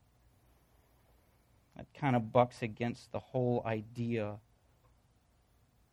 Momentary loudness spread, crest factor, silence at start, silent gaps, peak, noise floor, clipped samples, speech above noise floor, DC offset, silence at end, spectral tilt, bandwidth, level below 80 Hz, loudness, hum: 15 LU; 26 dB; 1.8 s; none; -12 dBFS; -70 dBFS; under 0.1%; 36 dB; under 0.1%; 1.55 s; -8 dB/octave; 11 kHz; -68 dBFS; -35 LUFS; none